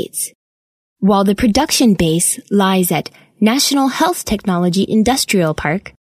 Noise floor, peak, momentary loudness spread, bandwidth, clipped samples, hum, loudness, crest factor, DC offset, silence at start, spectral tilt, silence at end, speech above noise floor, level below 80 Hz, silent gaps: under -90 dBFS; 0 dBFS; 8 LU; 15.5 kHz; under 0.1%; none; -15 LUFS; 14 dB; under 0.1%; 0 s; -4 dB/octave; 0.2 s; over 75 dB; -40 dBFS; 0.35-0.96 s